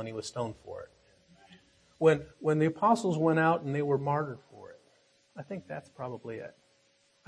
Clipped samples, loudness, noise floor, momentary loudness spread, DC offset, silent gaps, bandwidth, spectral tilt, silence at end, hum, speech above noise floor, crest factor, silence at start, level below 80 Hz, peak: under 0.1%; -30 LUFS; -68 dBFS; 21 LU; under 0.1%; none; 11 kHz; -7 dB/octave; 0.75 s; none; 39 dB; 20 dB; 0 s; -70 dBFS; -12 dBFS